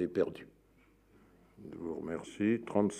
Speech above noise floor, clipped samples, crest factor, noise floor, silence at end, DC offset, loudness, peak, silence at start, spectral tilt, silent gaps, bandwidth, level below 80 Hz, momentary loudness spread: 32 dB; under 0.1%; 20 dB; -66 dBFS; 0 s; under 0.1%; -35 LUFS; -16 dBFS; 0 s; -6.5 dB/octave; none; 10.5 kHz; -68 dBFS; 21 LU